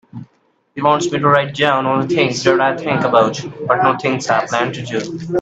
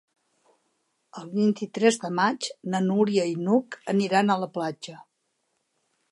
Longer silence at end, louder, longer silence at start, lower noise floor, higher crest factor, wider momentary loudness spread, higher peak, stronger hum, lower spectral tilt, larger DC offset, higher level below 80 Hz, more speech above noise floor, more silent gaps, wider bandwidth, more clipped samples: second, 0 s vs 1.1 s; first, -16 LUFS vs -25 LUFS; second, 0.15 s vs 1.15 s; second, -60 dBFS vs -76 dBFS; about the same, 16 dB vs 20 dB; about the same, 9 LU vs 10 LU; first, 0 dBFS vs -6 dBFS; neither; about the same, -5 dB/octave vs -5.5 dB/octave; neither; first, -56 dBFS vs -78 dBFS; second, 44 dB vs 51 dB; neither; second, 8.4 kHz vs 11.5 kHz; neither